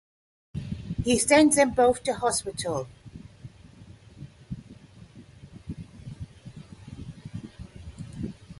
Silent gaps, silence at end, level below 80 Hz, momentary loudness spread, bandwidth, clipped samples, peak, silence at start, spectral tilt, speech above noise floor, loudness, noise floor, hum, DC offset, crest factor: none; 0.05 s; -50 dBFS; 27 LU; 12 kHz; under 0.1%; -6 dBFS; 0.55 s; -4 dB/octave; 27 dB; -24 LUFS; -49 dBFS; none; under 0.1%; 22 dB